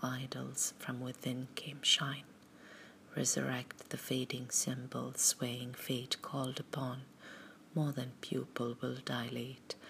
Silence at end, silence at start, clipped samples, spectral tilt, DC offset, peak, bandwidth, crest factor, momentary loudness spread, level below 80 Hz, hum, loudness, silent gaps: 0 s; 0 s; under 0.1%; -3 dB/octave; under 0.1%; -14 dBFS; 15.5 kHz; 24 dB; 15 LU; -82 dBFS; none; -37 LUFS; none